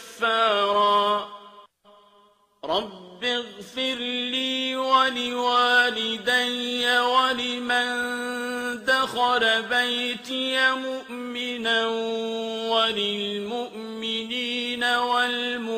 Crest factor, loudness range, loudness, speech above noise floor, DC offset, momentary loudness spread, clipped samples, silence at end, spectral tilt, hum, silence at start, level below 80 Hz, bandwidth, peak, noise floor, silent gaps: 18 dB; 5 LU; -23 LUFS; 35 dB; under 0.1%; 9 LU; under 0.1%; 0 s; -2 dB/octave; none; 0 s; -68 dBFS; 15.5 kHz; -6 dBFS; -59 dBFS; none